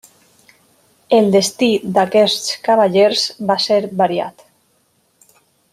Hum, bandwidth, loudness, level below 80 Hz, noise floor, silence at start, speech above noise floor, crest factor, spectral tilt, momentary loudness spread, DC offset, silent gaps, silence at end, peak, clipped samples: none; 15.5 kHz; -15 LUFS; -64 dBFS; -60 dBFS; 1.1 s; 46 dB; 16 dB; -4 dB/octave; 5 LU; under 0.1%; none; 1.45 s; -2 dBFS; under 0.1%